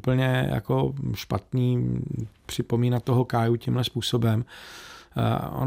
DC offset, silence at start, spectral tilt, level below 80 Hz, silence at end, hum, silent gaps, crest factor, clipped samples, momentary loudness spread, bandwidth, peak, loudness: under 0.1%; 0.05 s; -7 dB/octave; -50 dBFS; 0 s; none; none; 14 dB; under 0.1%; 11 LU; 16 kHz; -10 dBFS; -26 LUFS